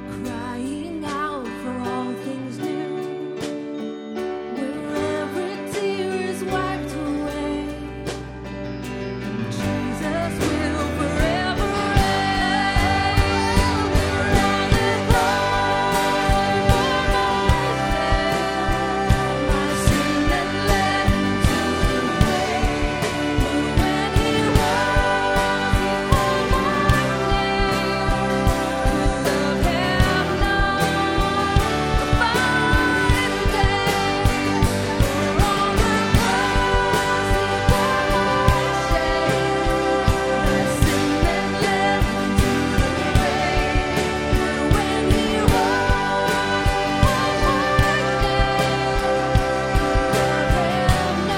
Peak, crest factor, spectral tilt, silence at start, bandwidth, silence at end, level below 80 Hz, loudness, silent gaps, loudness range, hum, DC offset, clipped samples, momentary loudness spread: -2 dBFS; 18 dB; -5 dB/octave; 0 s; 18 kHz; 0 s; -28 dBFS; -20 LUFS; none; 8 LU; none; under 0.1%; under 0.1%; 9 LU